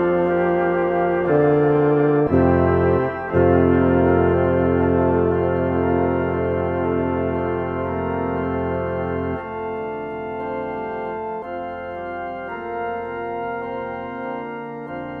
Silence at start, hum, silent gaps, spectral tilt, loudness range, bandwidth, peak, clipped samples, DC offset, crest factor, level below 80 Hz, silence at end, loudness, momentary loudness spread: 0 s; none; none; -11 dB/octave; 11 LU; 4.4 kHz; -4 dBFS; under 0.1%; under 0.1%; 16 dB; -42 dBFS; 0 s; -21 LUFS; 12 LU